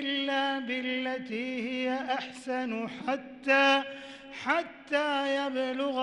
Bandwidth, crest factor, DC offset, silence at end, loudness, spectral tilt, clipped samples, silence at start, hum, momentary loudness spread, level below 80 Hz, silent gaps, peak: 11 kHz; 18 dB; under 0.1%; 0 s; -30 LUFS; -3.5 dB/octave; under 0.1%; 0 s; none; 10 LU; -72 dBFS; none; -14 dBFS